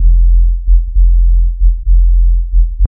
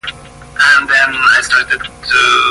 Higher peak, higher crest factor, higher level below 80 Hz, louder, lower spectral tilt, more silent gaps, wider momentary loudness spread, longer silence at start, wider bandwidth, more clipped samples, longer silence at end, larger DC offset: about the same, 0 dBFS vs 0 dBFS; about the same, 8 dB vs 12 dB; first, -8 dBFS vs -42 dBFS; second, -13 LUFS vs -10 LUFS; first, -15 dB/octave vs -0.5 dB/octave; neither; second, 3 LU vs 9 LU; about the same, 0 s vs 0.05 s; second, 0.3 kHz vs 11.5 kHz; neither; first, 0.15 s vs 0 s; neither